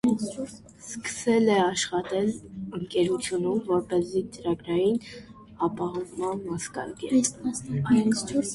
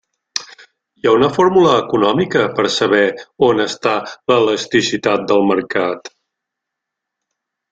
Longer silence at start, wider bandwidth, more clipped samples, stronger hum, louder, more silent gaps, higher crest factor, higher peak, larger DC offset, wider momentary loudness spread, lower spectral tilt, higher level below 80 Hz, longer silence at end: second, 0.05 s vs 0.35 s; first, 11.5 kHz vs 9.2 kHz; neither; neither; second, -27 LUFS vs -15 LUFS; neither; about the same, 16 dB vs 14 dB; second, -10 dBFS vs -2 dBFS; neither; first, 13 LU vs 9 LU; about the same, -5 dB/octave vs -4.5 dB/octave; about the same, -58 dBFS vs -56 dBFS; second, 0 s vs 1.65 s